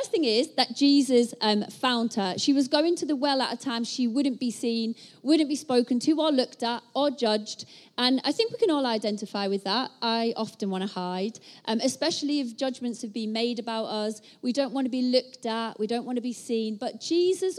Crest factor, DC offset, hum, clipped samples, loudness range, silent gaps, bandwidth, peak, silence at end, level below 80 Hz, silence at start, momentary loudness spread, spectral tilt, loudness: 20 dB; under 0.1%; none; under 0.1%; 5 LU; none; 13 kHz; -6 dBFS; 0 s; -82 dBFS; 0 s; 8 LU; -4 dB/octave; -27 LUFS